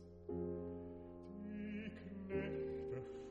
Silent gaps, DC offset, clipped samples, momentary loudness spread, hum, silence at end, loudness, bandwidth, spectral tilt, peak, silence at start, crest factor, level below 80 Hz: none; under 0.1%; under 0.1%; 8 LU; none; 0 s; -47 LUFS; 7.6 kHz; -8.5 dB/octave; -30 dBFS; 0 s; 16 dB; -64 dBFS